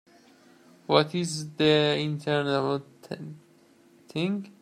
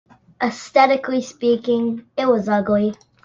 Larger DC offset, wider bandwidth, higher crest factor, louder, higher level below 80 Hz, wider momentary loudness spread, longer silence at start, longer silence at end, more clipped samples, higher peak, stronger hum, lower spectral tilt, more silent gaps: neither; first, 14 kHz vs 7.8 kHz; first, 24 dB vs 18 dB; second, -26 LUFS vs -19 LUFS; second, -70 dBFS vs -58 dBFS; first, 17 LU vs 9 LU; first, 0.9 s vs 0.4 s; second, 0.1 s vs 0.3 s; neither; about the same, -4 dBFS vs -2 dBFS; neither; about the same, -5 dB/octave vs -5.5 dB/octave; neither